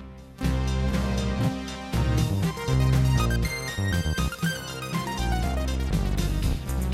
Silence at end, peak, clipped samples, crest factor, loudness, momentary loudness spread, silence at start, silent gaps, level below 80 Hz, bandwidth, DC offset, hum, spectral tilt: 0 s; -10 dBFS; under 0.1%; 14 dB; -27 LUFS; 7 LU; 0 s; none; -30 dBFS; 15.5 kHz; under 0.1%; none; -5.5 dB/octave